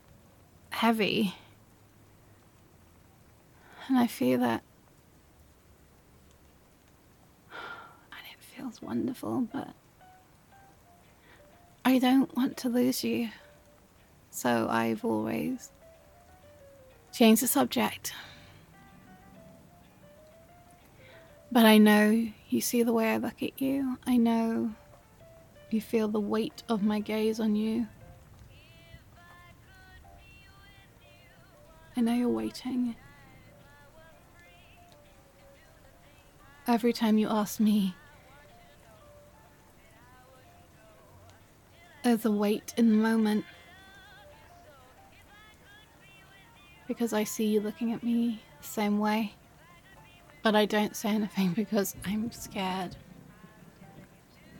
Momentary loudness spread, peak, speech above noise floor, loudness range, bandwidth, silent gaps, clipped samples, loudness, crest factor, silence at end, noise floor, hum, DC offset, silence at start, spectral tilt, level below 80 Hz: 19 LU; -8 dBFS; 33 dB; 12 LU; 17.5 kHz; none; under 0.1%; -28 LUFS; 24 dB; 0 s; -60 dBFS; none; under 0.1%; 0.7 s; -5 dB/octave; -64 dBFS